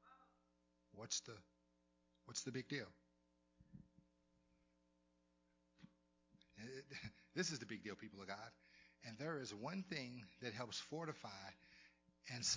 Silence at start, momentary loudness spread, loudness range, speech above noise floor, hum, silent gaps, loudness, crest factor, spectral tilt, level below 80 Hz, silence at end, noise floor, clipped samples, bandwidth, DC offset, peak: 0.05 s; 22 LU; 9 LU; 32 dB; none; none; -50 LUFS; 24 dB; -3 dB/octave; -82 dBFS; 0 s; -81 dBFS; under 0.1%; 7.8 kHz; under 0.1%; -28 dBFS